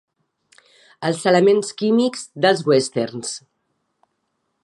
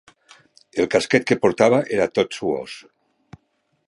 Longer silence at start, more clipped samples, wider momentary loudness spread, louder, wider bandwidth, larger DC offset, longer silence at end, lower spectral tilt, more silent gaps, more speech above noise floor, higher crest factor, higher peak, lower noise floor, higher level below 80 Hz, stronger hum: first, 1 s vs 0.75 s; neither; about the same, 12 LU vs 13 LU; about the same, -19 LUFS vs -20 LUFS; about the same, 11.5 kHz vs 11.5 kHz; neither; first, 1.25 s vs 1.05 s; about the same, -4.5 dB/octave vs -5 dB/octave; neither; first, 54 dB vs 50 dB; about the same, 18 dB vs 20 dB; about the same, -2 dBFS vs -2 dBFS; first, -73 dBFS vs -69 dBFS; second, -72 dBFS vs -58 dBFS; neither